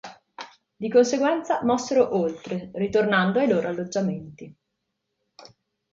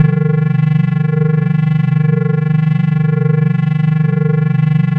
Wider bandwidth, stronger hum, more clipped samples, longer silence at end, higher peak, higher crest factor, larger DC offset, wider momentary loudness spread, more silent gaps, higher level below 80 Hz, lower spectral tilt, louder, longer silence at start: first, 7.8 kHz vs 4 kHz; neither; neither; first, 0.5 s vs 0 s; second, -6 dBFS vs 0 dBFS; first, 18 dB vs 12 dB; neither; first, 21 LU vs 1 LU; neither; second, -64 dBFS vs -54 dBFS; second, -5.5 dB/octave vs -11 dB/octave; second, -23 LUFS vs -13 LUFS; about the same, 0.05 s vs 0 s